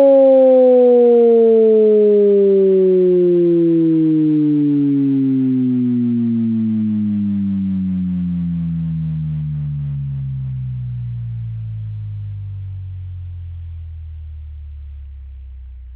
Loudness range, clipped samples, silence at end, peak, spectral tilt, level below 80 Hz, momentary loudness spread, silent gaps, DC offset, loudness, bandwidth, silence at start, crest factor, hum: 18 LU; under 0.1%; 0 s; -4 dBFS; -14 dB/octave; -36 dBFS; 21 LU; none; under 0.1%; -15 LUFS; 4 kHz; 0 s; 10 dB; none